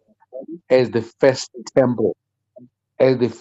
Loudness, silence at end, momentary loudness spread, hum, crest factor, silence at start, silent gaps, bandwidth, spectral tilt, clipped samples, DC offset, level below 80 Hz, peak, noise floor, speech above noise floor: -19 LUFS; 0.05 s; 19 LU; none; 16 dB; 0.35 s; none; 8.2 kHz; -6 dB/octave; under 0.1%; under 0.1%; -62 dBFS; -4 dBFS; -49 dBFS; 31 dB